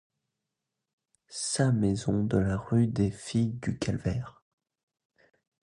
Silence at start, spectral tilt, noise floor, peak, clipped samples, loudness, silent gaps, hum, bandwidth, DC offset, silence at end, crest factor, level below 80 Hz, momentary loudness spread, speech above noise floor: 1.3 s; -6 dB/octave; -86 dBFS; -12 dBFS; under 0.1%; -29 LUFS; none; none; 11.5 kHz; under 0.1%; 1.35 s; 18 dB; -50 dBFS; 9 LU; 58 dB